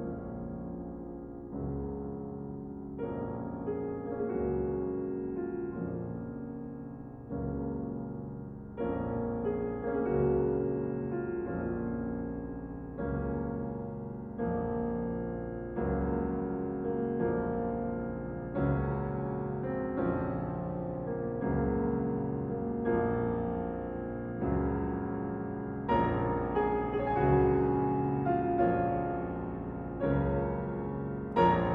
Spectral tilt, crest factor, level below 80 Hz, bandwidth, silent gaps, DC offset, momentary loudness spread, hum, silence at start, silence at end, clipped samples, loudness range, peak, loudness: -8.5 dB/octave; 20 dB; -46 dBFS; 5 kHz; none; under 0.1%; 11 LU; none; 0 s; 0 s; under 0.1%; 8 LU; -12 dBFS; -33 LUFS